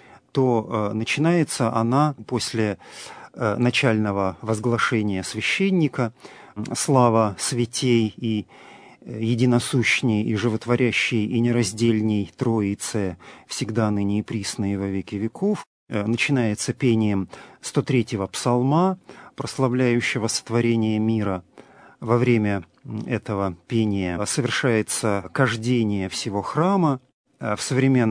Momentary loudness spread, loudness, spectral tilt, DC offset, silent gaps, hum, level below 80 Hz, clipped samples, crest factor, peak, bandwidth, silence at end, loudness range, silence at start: 10 LU; -22 LUFS; -5.5 dB/octave; under 0.1%; 15.67-15.87 s, 27.14-27.24 s; none; -60 dBFS; under 0.1%; 20 dB; -2 dBFS; 11 kHz; 0 s; 3 LU; 0.35 s